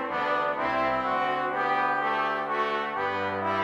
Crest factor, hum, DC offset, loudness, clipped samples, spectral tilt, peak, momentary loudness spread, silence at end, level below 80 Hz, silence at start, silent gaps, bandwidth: 12 dB; none; under 0.1%; -27 LUFS; under 0.1%; -5.5 dB/octave; -14 dBFS; 3 LU; 0 s; -60 dBFS; 0 s; none; 11.5 kHz